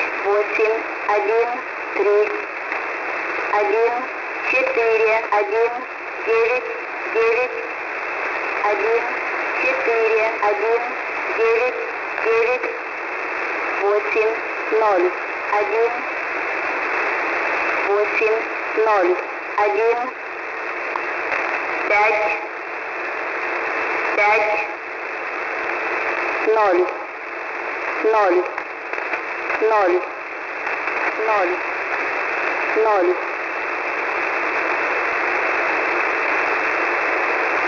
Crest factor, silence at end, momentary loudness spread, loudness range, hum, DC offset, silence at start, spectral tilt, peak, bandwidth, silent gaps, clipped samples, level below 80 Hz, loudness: 14 dB; 0 s; 8 LU; 2 LU; none; under 0.1%; 0 s; -3.5 dB/octave; -6 dBFS; 6 kHz; none; under 0.1%; -62 dBFS; -20 LUFS